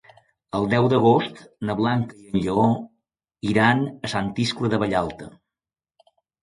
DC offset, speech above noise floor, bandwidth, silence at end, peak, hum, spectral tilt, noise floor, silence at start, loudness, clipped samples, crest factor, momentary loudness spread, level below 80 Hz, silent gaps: under 0.1%; over 69 dB; 11.5 kHz; 1.15 s; -4 dBFS; none; -6.5 dB/octave; under -90 dBFS; 0.55 s; -22 LUFS; under 0.1%; 20 dB; 13 LU; -52 dBFS; none